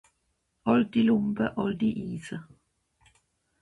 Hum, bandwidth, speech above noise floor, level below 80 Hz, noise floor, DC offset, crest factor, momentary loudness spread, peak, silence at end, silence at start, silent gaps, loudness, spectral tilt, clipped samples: none; 11 kHz; 50 dB; -60 dBFS; -76 dBFS; under 0.1%; 20 dB; 14 LU; -10 dBFS; 1.2 s; 0.65 s; none; -27 LUFS; -7.5 dB/octave; under 0.1%